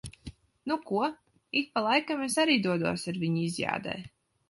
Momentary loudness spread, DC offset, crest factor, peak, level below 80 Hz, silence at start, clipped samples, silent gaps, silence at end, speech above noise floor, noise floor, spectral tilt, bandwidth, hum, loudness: 16 LU; under 0.1%; 20 dB; -10 dBFS; -60 dBFS; 0.05 s; under 0.1%; none; 0.4 s; 20 dB; -49 dBFS; -4.5 dB/octave; 11.5 kHz; none; -29 LUFS